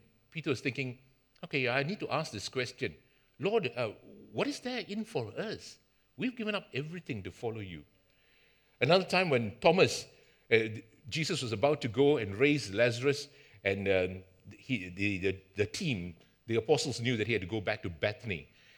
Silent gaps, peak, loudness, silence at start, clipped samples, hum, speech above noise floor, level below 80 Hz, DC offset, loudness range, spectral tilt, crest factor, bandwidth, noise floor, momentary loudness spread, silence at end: none; -8 dBFS; -32 LUFS; 0.35 s; under 0.1%; none; 35 dB; -70 dBFS; under 0.1%; 8 LU; -5 dB/octave; 24 dB; 17.5 kHz; -67 dBFS; 13 LU; 0.35 s